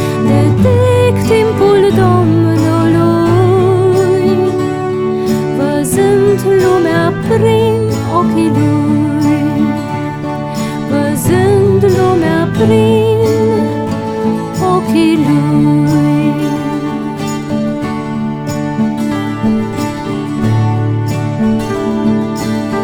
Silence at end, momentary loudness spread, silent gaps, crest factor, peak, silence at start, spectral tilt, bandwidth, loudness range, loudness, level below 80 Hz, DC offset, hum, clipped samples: 0 s; 8 LU; none; 10 dB; 0 dBFS; 0 s; -7 dB/octave; 17.5 kHz; 6 LU; -12 LUFS; -38 dBFS; under 0.1%; none; under 0.1%